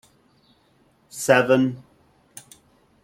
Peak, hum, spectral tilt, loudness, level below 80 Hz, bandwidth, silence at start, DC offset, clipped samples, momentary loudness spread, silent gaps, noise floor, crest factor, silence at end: -2 dBFS; none; -5 dB/octave; -20 LUFS; -66 dBFS; 16 kHz; 1.15 s; under 0.1%; under 0.1%; 27 LU; none; -61 dBFS; 24 dB; 1.25 s